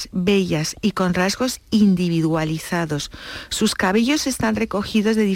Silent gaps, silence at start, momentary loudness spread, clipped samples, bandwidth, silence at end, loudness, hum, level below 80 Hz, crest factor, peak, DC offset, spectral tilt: none; 0 s; 6 LU; under 0.1%; 17 kHz; 0 s; -20 LUFS; none; -44 dBFS; 12 dB; -6 dBFS; under 0.1%; -5 dB/octave